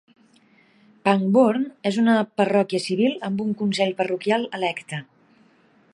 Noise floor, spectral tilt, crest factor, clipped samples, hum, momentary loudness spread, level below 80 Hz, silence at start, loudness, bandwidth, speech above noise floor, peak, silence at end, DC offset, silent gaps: -58 dBFS; -6 dB/octave; 20 dB; under 0.1%; none; 8 LU; -72 dBFS; 1.05 s; -22 LUFS; 11 kHz; 37 dB; -4 dBFS; 0.9 s; under 0.1%; none